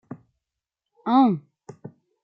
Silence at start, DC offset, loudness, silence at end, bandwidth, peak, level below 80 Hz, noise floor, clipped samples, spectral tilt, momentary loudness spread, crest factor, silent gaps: 0.1 s; under 0.1%; -22 LUFS; 0.85 s; 5.4 kHz; -8 dBFS; -78 dBFS; -86 dBFS; under 0.1%; -8.5 dB/octave; 25 LU; 18 dB; none